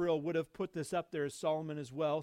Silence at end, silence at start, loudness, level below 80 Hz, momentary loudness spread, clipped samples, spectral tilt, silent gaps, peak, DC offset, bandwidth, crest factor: 0 s; 0 s; -37 LUFS; -74 dBFS; 6 LU; under 0.1%; -6 dB/octave; none; -22 dBFS; under 0.1%; 15.5 kHz; 14 dB